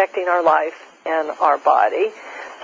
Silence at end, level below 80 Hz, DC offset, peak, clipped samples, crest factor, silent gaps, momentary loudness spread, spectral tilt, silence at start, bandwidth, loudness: 0 s; -72 dBFS; under 0.1%; -4 dBFS; under 0.1%; 16 dB; none; 15 LU; -4 dB/octave; 0 s; 7.6 kHz; -18 LUFS